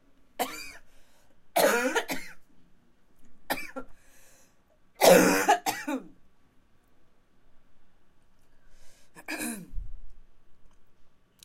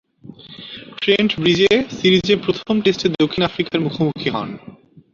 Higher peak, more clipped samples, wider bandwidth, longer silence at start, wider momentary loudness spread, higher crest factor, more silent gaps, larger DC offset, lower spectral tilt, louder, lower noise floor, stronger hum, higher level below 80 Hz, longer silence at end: second, -6 dBFS vs -2 dBFS; neither; first, 16 kHz vs 7.6 kHz; about the same, 0.35 s vs 0.25 s; first, 26 LU vs 19 LU; first, 24 dB vs 16 dB; neither; neither; second, -3 dB/octave vs -5.5 dB/octave; second, -26 LUFS vs -17 LUFS; first, -60 dBFS vs -40 dBFS; neither; about the same, -52 dBFS vs -52 dBFS; about the same, 0.35 s vs 0.45 s